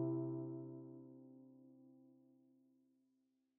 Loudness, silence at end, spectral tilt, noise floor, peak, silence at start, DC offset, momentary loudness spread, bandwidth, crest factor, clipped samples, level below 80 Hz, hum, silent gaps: -48 LUFS; 1.4 s; -8 dB/octave; -83 dBFS; -30 dBFS; 0 s; under 0.1%; 23 LU; 1.5 kHz; 20 dB; under 0.1%; -90 dBFS; none; none